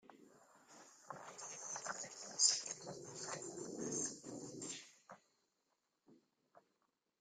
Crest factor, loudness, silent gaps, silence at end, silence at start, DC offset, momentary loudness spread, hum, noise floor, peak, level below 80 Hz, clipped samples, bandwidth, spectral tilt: 30 dB; -42 LUFS; none; 0.6 s; 0.05 s; under 0.1%; 27 LU; none; -86 dBFS; -16 dBFS; -88 dBFS; under 0.1%; 15 kHz; -1 dB/octave